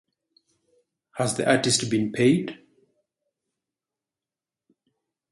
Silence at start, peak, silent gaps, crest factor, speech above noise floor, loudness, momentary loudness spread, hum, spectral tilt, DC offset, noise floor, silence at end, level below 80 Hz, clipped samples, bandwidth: 1.15 s; -6 dBFS; none; 22 dB; over 68 dB; -23 LUFS; 11 LU; none; -4 dB/octave; under 0.1%; under -90 dBFS; 2.8 s; -64 dBFS; under 0.1%; 11.5 kHz